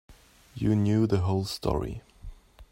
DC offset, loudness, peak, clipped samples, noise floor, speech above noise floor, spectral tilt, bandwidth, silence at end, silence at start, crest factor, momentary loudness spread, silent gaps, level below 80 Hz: under 0.1%; -27 LUFS; -10 dBFS; under 0.1%; -47 dBFS; 22 dB; -7.5 dB/octave; 16 kHz; 0.1 s; 0.1 s; 18 dB; 15 LU; none; -46 dBFS